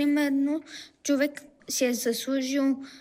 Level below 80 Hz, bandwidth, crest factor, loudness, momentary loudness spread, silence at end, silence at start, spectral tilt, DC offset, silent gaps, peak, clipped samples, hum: -76 dBFS; 16 kHz; 14 dB; -27 LUFS; 9 LU; 0 s; 0 s; -2.5 dB/octave; under 0.1%; none; -14 dBFS; under 0.1%; none